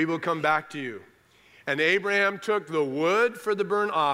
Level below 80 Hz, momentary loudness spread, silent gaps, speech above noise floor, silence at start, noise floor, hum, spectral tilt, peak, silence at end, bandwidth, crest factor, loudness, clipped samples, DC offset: -76 dBFS; 13 LU; none; 32 dB; 0 s; -58 dBFS; none; -5 dB/octave; -10 dBFS; 0 s; 15.5 kHz; 16 dB; -25 LUFS; under 0.1%; under 0.1%